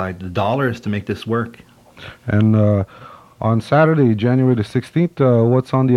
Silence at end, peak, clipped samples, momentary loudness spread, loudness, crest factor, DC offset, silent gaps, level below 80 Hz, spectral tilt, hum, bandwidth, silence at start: 0 s; -2 dBFS; under 0.1%; 10 LU; -17 LUFS; 16 dB; under 0.1%; none; -54 dBFS; -9 dB/octave; none; 11 kHz; 0 s